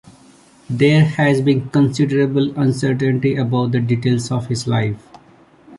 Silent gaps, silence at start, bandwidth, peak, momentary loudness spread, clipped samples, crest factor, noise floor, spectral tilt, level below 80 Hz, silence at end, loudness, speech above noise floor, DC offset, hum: none; 0.7 s; 11.5 kHz; -2 dBFS; 7 LU; under 0.1%; 14 dB; -48 dBFS; -7 dB/octave; -52 dBFS; 0 s; -17 LUFS; 32 dB; under 0.1%; none